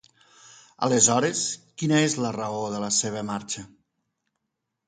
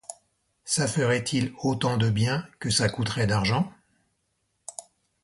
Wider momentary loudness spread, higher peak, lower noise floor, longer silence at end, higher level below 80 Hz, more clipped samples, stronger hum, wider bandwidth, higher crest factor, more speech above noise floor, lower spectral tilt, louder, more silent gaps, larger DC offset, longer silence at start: second, 12 LU vs 17 LU; first, -4 dBFS vs -10 dBFS; first, -81 dBFS vs -75 dBFS; first, 1.2 s vs 0.45 s; second, -66 dBFS vs -52 dBFS; neither; neither; second, 9.6 kHz vs 11.5 kHz; first, 22 dB vs 16 dB; first, 57 dB vs 50 dB; about the same, -3.5 dB/octave vs -4.5 dB/octave; about the same, -24 LUFS vs -26 LUFS; neither; neither; first, 0.45 s vs 0.1 s